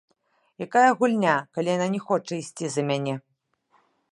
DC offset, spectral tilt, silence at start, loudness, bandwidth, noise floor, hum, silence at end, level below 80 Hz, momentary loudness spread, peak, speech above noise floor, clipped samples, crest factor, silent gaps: under 0.1%; -5.5 dB/octave; 0.6 s; -24 LUFS; 11.5 kHz; -67 dBFS; none; 0.95 s; -76 dBFS; 12 LU; -4 dBFS; 44 dB; under 0.1%; 20 dB; none